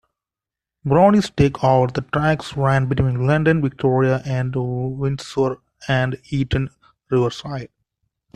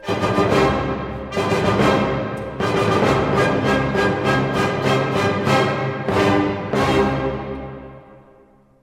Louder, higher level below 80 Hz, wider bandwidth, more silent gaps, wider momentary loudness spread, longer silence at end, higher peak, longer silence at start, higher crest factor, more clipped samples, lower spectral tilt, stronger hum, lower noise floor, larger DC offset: about the same, -19 LUFS vs -19 LUFS; about the same, -42 dBFS vs -40 dBFS; second, 9.8 kHz vs 16 kHz; neither; about the same, 9 LU vs 8 LU; about the same, 0.7 s vs 0.7 s; about the same, -2 dBFS vs -4 dBFS; first, 0.85 s vs 0 s; about the same, 16 dB vs 16 dB; neither; first, -7.5 dB/octave vs -6 dB/octave; neither; first, -88 dBFS vs -51 dBFS; neither